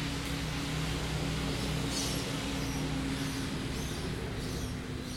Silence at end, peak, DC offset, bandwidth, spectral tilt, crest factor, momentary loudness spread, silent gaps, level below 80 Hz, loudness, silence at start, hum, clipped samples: 0 s; -20 dBFS; under 0.1%; 16.5 kHz; -4.5 dB/octave; 14 dB; 4 LU; none; -42 dBFS; -34 LUFS; 0 s; none; under 0.1%